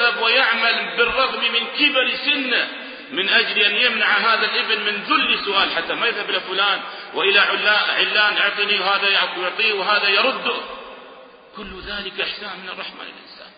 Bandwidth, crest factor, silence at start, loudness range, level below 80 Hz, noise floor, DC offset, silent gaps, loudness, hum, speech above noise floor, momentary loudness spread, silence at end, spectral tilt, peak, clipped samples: 5.2 kHz; 18 dB; 0 s; 4 LU; -56 dBFS; -43 dBFS; under 0.1%; none; -17 LUFS; none; 23 dB; 15 LU; 0.1 s; -7 dB/octave; -2 dBFS; under 0.1%